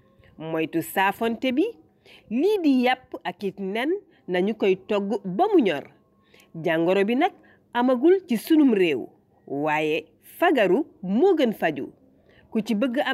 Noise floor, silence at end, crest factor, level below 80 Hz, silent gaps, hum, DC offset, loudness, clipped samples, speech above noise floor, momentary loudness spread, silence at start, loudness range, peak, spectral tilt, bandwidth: -57 dBFS; 0 s; 14 dB; -70 dBFS; none; none; under 0.1%; -23 LUFS; under 0.1%; 35 dB; 11 LU; 0.4 s; 3 LU; -10 dBFS; -6 dB/octave; 15.5 kHz